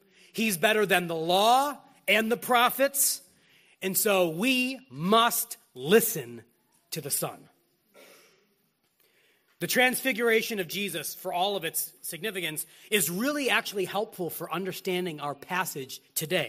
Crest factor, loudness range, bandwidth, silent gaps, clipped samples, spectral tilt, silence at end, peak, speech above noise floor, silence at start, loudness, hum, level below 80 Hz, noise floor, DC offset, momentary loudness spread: 22 dB; 6 LU; 15.5 kHz; none; under 0.1%; -2.5 dB/octave; 0 s; -8 dBFS; 45 dB; 0.35 s; -27 LUFS; none; -76 dBFS; -72 dBFS; under 0.1%; 12 LU